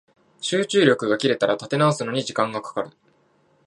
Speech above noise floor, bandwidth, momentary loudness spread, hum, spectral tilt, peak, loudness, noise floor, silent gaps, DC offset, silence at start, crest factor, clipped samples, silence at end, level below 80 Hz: 40 dB; 11 kHz; 13 LU; none; -5 dB/octave; -2 dBFS; -22 LUFS; -62 dBFS; none; under 0.1%; 0.4 s; 20 dB; under 0.1%; 0.75 s; -70 dBFS